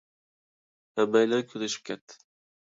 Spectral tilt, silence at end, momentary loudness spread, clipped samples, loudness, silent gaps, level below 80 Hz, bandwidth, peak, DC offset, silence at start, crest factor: -4 dB/octave; 0.5 s; 15 LU; under 0.1%; -27 LUFS; 2.01-2.08 s; -80 dBFS; 7.8 kHz; -8 dBFS; under 0.1%; 0.95 s; 22 dB